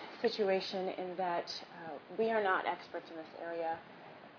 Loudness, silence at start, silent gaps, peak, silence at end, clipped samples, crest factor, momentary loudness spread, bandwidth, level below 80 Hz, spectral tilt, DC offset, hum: -37 LUFS; 0 s; none; -18 dBFS; 0 s; under 0.1%; 18 dB; 15 LU; 5.4 kHz; -84 dBFS; -2 dB/octave; under 0.1%; none